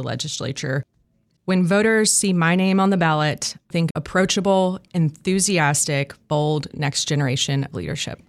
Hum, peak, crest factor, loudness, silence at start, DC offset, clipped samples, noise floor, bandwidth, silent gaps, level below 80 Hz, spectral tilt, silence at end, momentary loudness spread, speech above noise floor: none; -6 dBFS; 16 dB; -20 LUFS; 0 s; under 0.1%; under 0.1%; -64 dBFS; 14.5 kHz; 3.91-3.95 s; -52 dBFS; -4.5 dB/octave; 0.15 s; 9 LU; 44 dB